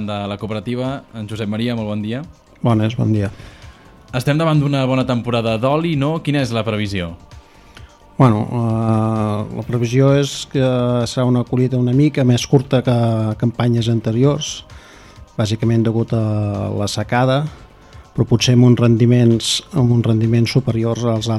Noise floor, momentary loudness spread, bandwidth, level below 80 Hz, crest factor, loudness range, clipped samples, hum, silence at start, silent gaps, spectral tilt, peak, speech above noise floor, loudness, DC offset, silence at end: -42 dBFS; 10 LU; 12 kHz; -44 dBFS; 16 dB; 5 LU; under 0.1%; none; 0 s; none; -6.5 dB/octave; 0 dBFS; 25 dB; -17 LUFS; under 0.1%; 0 s